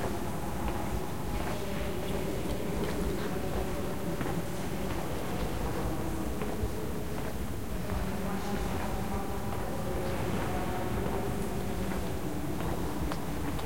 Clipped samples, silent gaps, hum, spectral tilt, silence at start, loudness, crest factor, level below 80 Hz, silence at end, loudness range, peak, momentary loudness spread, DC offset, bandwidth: under 0.1%; none; none; -6 dB/octave; 0 s; -35 LUFS; 16 dB; -42 dBFS; 0 s; 1 LU; -18 dBFS; 3 LU; 2%; 16.5 kHz